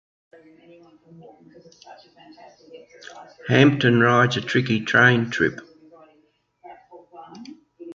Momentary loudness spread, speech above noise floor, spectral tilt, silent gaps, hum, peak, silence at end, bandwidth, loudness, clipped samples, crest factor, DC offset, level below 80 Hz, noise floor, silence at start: 26 LU; 41 dB; -6 dB/octave; none; none; -2 dBFS; 0 s; 7.6 kHz; -18 LUFS; under 0.1%; 22 dB; under 0.1%; -60 dBFS; -63 dBFS; 1.9 s